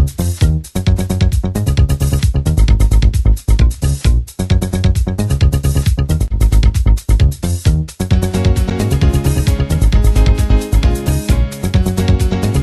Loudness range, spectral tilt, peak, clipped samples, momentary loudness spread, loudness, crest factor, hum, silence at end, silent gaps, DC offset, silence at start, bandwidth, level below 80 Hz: 1 LU; -6.5 dB/octave; -2 dBFS; under 0.1%; 4 LU; -14 LUFS; 10 dB; none; 0 s; none; under 0.1%; 0 s; 12.5 kHz; -14 dBFS